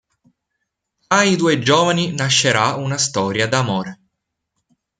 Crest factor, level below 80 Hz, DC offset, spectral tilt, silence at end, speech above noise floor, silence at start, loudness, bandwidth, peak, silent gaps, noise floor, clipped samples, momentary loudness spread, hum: 18 dB; -58 dBFS; under 0.1%; -3.5 dB/octave; 1.05 s; 59 dB; 1.1 s; -16 LUFS; 9.6 kHz; 0 dBFS; none; -76 dBFS; under 0.1%; 5 LU; none